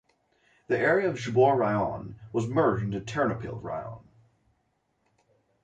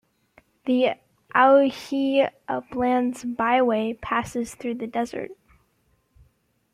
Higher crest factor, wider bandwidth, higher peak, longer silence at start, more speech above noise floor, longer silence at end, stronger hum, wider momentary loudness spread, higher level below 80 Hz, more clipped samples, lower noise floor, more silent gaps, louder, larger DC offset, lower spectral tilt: about the same, 18 dB vs 20 dB; second, 8.8 kHz vs 14 kHz; second, -10 dBFS vs -6 dBFS; about the same, 0.7 s vs 0.65 s; about the same, 47 dB vs 45 dB; first, 1.65 s vs 1.4 s; neither; about the same, 14 LU vs 13 LU; about the same, -58 dBFS vs -58 dBFS; neither; first, -74 dBFS vs -67 dBFS; neither; second, -27 LUFS vs -23 LUFS; neither; first, -7 dB/octave vs -5 dB/octave